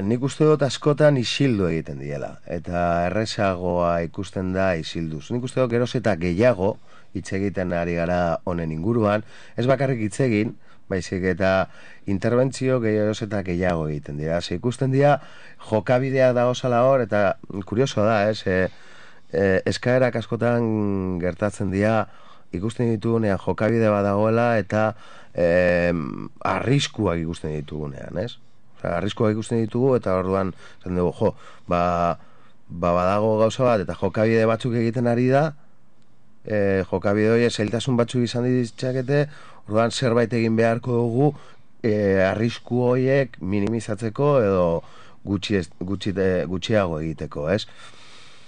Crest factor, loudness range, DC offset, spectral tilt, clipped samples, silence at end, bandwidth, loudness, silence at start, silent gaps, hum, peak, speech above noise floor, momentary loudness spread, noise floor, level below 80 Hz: 16 dB; 3 LU; 0.9%; -6.5 dB/octave; under 0.1%; 0.6 s; 10 kHz; -22 LUFS; 0 s; none; none; -6 dBFS; 38 dB; 10 LU; -60 dBFS; -50 dBFS